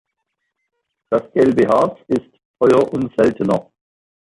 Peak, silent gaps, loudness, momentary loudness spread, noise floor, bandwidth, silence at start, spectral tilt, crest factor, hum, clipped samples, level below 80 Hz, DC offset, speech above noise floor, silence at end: -2 dBFS; 2.45-2.54 s; -17 LUFS; 8 LU; -75 dBFS; 11 kHz; 1.1 s; -7.5 dB/octave; 16 dB; none; under 0.1%; -54 dBFS; under 0.1%; 59 dB; 0.75 s